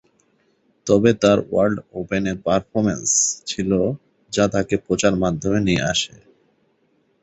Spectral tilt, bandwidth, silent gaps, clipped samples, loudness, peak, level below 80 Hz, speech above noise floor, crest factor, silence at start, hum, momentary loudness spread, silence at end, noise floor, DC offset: -4 dB/octave; 8.4 kHz; none; under 0.1%; -20 LUFS; -2 dBFS; -46 dBFS; 44 dB; 18 dB; 0.85 s; none; 8 LU; 1.15 s; -64 dBFS; under 0.1%